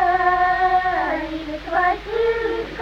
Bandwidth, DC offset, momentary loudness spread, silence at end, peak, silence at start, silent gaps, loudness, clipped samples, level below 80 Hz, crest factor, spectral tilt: 7.2 kHz; under 0.1%; 8 LU; 0 s; -6 dBFS; 0 s; none; -20 LUFS; under 0.1%; -40 dBFS; 14 dB; -5.5 dB/octave